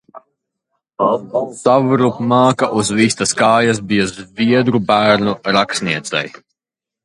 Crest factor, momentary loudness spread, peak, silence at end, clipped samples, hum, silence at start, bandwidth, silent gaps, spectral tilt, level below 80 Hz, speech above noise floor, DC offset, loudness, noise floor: 16 dB; 7 LU; 0 dBFS; 0.75 s; under 0.1%; none; 0.15 s; 11.5 kHz; none; -4.5 dB/octave; -52 dBFS; 73 dB; under 0.1%; -15 LUFS; -87 dBFS